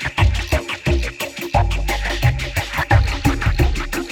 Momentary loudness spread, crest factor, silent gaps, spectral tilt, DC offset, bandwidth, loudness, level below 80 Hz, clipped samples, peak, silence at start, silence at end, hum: 5 LU; 16 dB; none; -5 dB/octave; under 0.1%; 18 kHz; -20 LUFS; -22 dBFS; under 0.1%; -4 dBFS; 0 s; 0 s; none